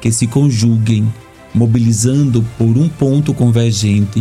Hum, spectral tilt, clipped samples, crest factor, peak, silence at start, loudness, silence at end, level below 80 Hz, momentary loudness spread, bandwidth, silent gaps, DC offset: none; -6.5 dB/octave; under 0.1%; 10 dB; -2 dBFS; 0 s; -13 LUFS; 0 s; -42 dBFS; 4 LU; 13.5 kHz; none; under 0.1%